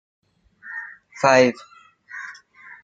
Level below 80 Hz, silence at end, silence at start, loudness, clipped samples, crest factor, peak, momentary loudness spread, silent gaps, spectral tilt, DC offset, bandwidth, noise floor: -70 dBFS; 0.5 s; 0.65 s; -17 LUFS; under 0.1%; 22 dB; -2 dBFS; 23 LU; none; -4.5 dB/octave; under 0.1%; 7.8 kHz; -46 dBFS